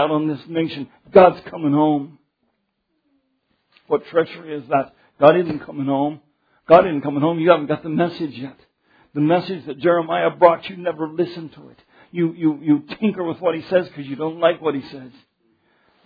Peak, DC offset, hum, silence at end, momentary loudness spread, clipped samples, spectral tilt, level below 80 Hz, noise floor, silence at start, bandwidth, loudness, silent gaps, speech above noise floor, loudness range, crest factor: 0 dBFS; under 0.1%; none; 0.95 s; 16 LU; under 0.1%; -9.5 dB/octave; -60 dBFS; -72 dBFS; 0 s; 5.4 kHz; -19 LUFS; none; 53 dB; 5 LU; 20 dB